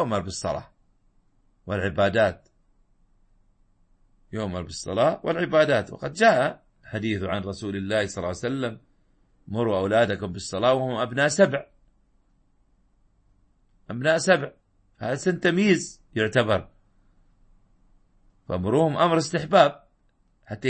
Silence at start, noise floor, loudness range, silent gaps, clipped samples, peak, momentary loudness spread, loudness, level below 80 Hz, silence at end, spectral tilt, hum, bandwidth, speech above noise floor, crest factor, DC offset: 0 s; -64 dBFS; 5 LU; none; under 0.1%; -4 dBFS; 13 LU; -24 LUFS; -56 dBFS; 0 s; -5 dB/octave; none; 8.8 kHz; 41 dB; 22 dB; under 0.1%